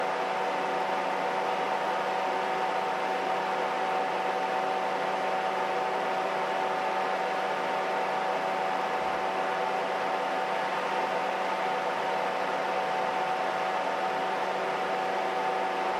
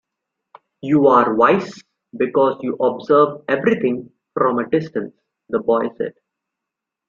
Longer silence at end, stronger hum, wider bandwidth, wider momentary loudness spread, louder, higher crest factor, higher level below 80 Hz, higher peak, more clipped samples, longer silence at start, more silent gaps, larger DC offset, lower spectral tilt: second, 0 s vs 1 s; neither; first, 14 kHz vs 7.2 kHz; second, 1 LU vs 15 LU; second, -29 LUFS vs -18 LUFS; second, 12 dB vs 18 dB; second, -74 dBFS vs -62 dBFS; second, -16 dBFS vs -2 dBFS; neither; second, 0 s vs 0.85 s; neither; neither; second, -3.5 dB/octave vs -7.5 dB/octave